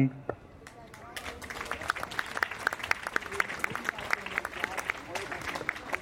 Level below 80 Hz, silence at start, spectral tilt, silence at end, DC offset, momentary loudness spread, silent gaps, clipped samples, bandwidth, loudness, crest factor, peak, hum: -58 dBFS; 0 s; -4 dB/octave; 0 s; under 0.1%; 12 LU; none; under 0.1%; 17 kHz; -33 LUFS; 28 dB; -8 dBFS; none